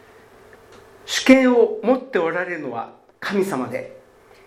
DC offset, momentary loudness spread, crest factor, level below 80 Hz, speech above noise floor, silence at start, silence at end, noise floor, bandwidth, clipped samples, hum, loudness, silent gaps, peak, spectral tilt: under 0.1%; 18 LU; 20 dB; -60 dBFS; 29 dB; 1.05 s; 0.5 s; -48 dBFS; 15 kHz; under 0.1%; none; -19 LUFS; none; 0 dBFS; -4 dB/octave